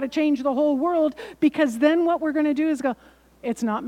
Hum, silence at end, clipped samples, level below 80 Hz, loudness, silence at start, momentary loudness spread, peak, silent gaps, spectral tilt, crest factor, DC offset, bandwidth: none; 0 s; under 0.1%; -62 dBFS; -22 LUFS; 0 s; 8 LU; -6 dBFS; none; -5.5 dB/octave; 16 dB; under 0.1%; 12.5 kHz